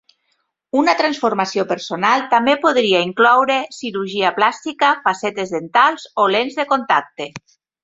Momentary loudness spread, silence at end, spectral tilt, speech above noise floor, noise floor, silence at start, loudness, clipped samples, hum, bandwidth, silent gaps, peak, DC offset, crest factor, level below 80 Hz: 8 LU; 0.45 s; -4 dB/octave; 52 dB; -68 dBFS; 0.75 s; -17 LUFS; under 0.1%; none; 8 kHz; none; -2 dBFS; under 0.1%; 16 dB; -64 dBFS